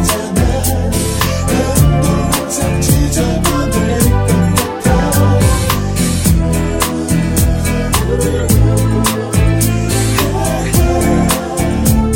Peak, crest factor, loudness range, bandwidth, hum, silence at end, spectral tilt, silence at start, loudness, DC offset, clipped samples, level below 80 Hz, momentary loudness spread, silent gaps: 0 dBFS; 12 dB; 1 LU; 17.5 kHz; none; 0 s; -5 dB/octave; 0 s; -13 LUFS; under 0.1%; under 0.1%; -20 dBFS; 4 LU; none